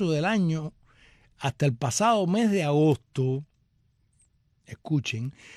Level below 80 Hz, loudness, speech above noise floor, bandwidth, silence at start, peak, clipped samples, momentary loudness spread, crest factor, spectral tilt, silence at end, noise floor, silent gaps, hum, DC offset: -62 dBFS; -26 LUFS; 42 dB; 14 kHz; 0 s; -12 dBFS; under 0.1%; 11 LU; 16 dB; -6 dB/octave; 0 s; -68 dBFS; none; none; under 0.1%